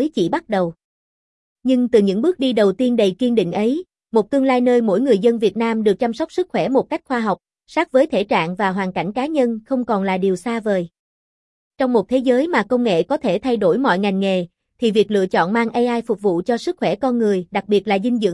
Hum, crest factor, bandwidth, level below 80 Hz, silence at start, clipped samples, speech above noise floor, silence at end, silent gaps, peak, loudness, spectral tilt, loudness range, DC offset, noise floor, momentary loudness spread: none; 16 dB; 12 kHz; -58 dBFS; 0 s; under 0.1%; over 72 dB; 0 s; 0.84-1.56 s, 10.99-11.71 s; -4 dBFS; -19 LUFS; -6.5 dB/octave; 3 LU; under 0.1%; under -90 dBFS; 6 LU